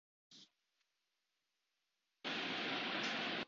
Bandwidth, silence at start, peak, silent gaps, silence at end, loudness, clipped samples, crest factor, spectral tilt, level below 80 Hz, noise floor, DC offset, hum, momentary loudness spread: 7.6 kHz; 0.3 s; -28 dBFS; none; 0 s; -40 LUFS; under 0.1%; 18 dB; -0.5 dB/octave; -88 dBFS; -88 dBFS; under 0.1%; none; 5 LU